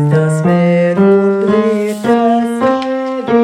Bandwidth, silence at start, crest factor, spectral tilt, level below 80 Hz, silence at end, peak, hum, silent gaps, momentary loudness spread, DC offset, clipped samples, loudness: 13.5 kHz; 0 s; 10 dB; -8 dB/octave; -52 dBFS; 0 s; 0 dBFS; none; none; 6 LU; under 0.1%; under 0.1%; -12 LUFS